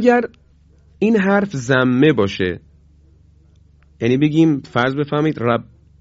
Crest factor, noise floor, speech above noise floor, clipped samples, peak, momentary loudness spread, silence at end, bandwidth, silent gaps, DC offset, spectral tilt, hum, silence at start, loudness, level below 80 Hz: 16 dB; -50 dBFS; 35 dB; under 0.1%; 0 dBFS; 8 LU; 0.4 s; 7.8 kHz; none; under 0.1%; -7 dB/octave; none; 0 s; -17 LUFS; -48 dBFS